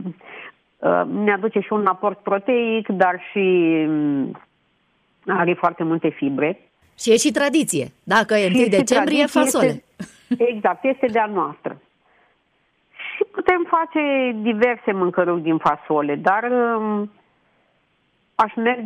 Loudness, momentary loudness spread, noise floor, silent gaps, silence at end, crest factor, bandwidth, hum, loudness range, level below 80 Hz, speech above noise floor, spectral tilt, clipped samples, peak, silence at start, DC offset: -20 LUFS; 11 LU; -65 dBFS; none; 0 s; 16 dB; 15.5 kHz; none; 5 LU; -62 dBFS; 46 dB; -4.5 dB/octave; under 0.1%; -4 dBFS; 0 s; under 0.1%